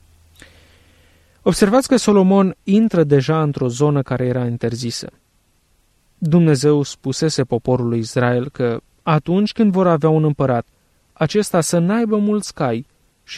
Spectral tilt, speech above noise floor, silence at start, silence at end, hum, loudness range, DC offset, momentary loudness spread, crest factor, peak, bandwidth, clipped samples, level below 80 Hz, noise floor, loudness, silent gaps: -6.5 dB/octave; 44 dB; 1.45 s; 0 s; none; 4 LU; under 0.1%; 8 LU; 16 dB; -2 dBFS; 14.5 kHz; under 0.1%; -50 dBFS; -60 dBFS; -17 LUFS; none